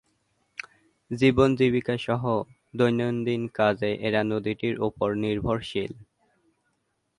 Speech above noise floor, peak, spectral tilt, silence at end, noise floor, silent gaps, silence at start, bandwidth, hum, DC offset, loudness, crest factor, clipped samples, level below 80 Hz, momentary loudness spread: 50 dB; -6 dBFS; -7.5 dB/octave; 1.15 s; -75 dBFS; none; 1.1 s; 11 kHz; none; under 0.1%; -25 LUFS; 20 dB; under 0.1%; -52 dBFS; 16 LU